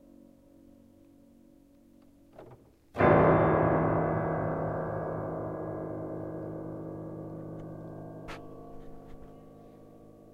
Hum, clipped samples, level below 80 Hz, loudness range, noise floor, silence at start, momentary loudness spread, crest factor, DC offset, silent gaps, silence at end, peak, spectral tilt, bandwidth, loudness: none; under 0.1%; -52 dBFS; 16 LU; -59 dBFS; 2.35 s; 26 LU; 22 dB; under 0.1%; none; 0.05 s; -10 dBFS; -9.5 dB/octave; 5.2 kHz; -29 LUFS